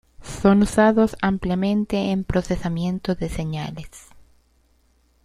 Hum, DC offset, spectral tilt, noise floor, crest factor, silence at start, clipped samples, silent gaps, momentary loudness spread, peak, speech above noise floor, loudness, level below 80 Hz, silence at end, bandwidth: none; under 0.1%; -6.5 dB/octave; -61 dBFS; 20 dB; 0.2 s; under 0.1%; none; 14 LU; -2 dBFS; 40 dB; -21 LUFS; -40 dBFS; 1.05 s; 12 kHz